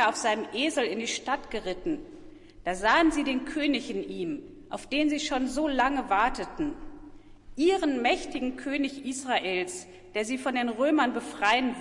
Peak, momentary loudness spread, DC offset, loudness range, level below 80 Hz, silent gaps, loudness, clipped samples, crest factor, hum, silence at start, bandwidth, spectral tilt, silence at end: -10 dBFS; 11 LU; under 0.1%; 1 LU; -50 dBFS; none; -28 LUFS; under 0.1%; 18 dB; none; 0 s; 11.5 kHz; -3 dB/octave; 0 s